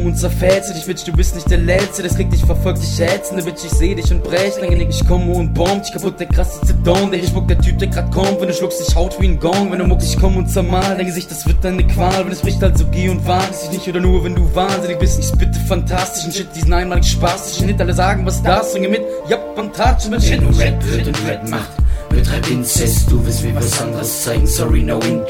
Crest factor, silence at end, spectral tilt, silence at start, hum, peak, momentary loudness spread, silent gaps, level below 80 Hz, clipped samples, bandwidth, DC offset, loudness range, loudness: 14 dB; 0 s; -5.5 dB/octave; 0 s; none; 0 dBFS; 5 LU; none; -18 dBFS; under 0.1%; 17 kHz; under 0.1%; 1 LU; -16 LUFS